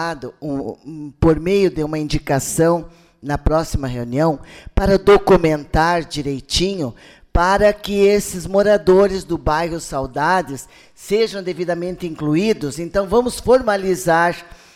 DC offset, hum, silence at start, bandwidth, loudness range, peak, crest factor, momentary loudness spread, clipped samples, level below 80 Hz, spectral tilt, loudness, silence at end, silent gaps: under 0.1%; none; 0 s; 16 kHz; 4 LU; -4 dBFS; 14 dB; 12 LU; under 0.1%; -32 dBFS; -5.5 dB/octave; -18 LUFS; 0.3 s; none